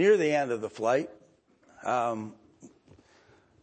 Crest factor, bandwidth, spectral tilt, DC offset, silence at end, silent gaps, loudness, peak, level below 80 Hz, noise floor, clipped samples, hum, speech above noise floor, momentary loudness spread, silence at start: 18 dB; 8.8 kHz; -5.5 dB/octave; under 0.1%; 0.95 s; none; -29 LUFS; -12 dBFS; -76 dBFS; -62 dBFS; under 0.1%; none; 36 dB; 15 LU; 0 s